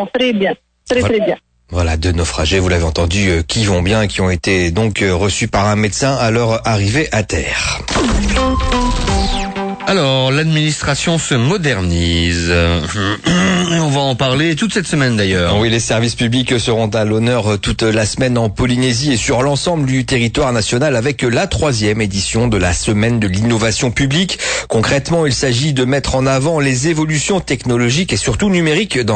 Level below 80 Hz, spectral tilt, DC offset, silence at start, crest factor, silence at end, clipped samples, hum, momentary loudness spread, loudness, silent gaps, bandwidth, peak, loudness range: -28 dBFS; -4.5 dB/octave; under 0.1%; 0 s; 10 dB; 0 s; under 0.1%; none; 3 LU; -14 LUFS; none; 9.2 kHz; -4 dBFS; 1 LU